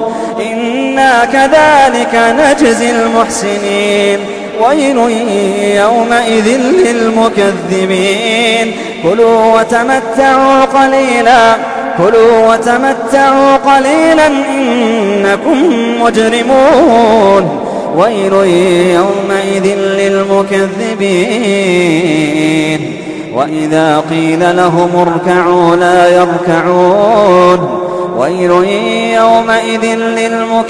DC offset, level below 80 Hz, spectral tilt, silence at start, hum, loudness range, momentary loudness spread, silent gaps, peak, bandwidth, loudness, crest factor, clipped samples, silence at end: under 0.1%; -44 dBFS; -5 dB/octave; 0 s; none; 3 LU; 7 LU; none; 0 dBFS; 11 kHz; -9 LUFS; 8 dB; 0.4%; 0 s